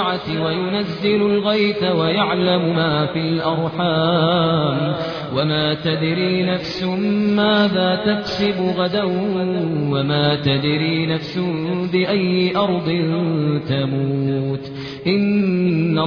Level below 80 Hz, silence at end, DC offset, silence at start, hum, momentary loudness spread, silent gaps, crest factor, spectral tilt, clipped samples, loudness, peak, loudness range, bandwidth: -52 dBFS; 0 s; under 0.1%; 0 s; none; 5 LU; none; 14 dB; -8 dB/octave; under 0.1%; -19 LUFS; -4 dBFS; 2 LU; 5.4 kHz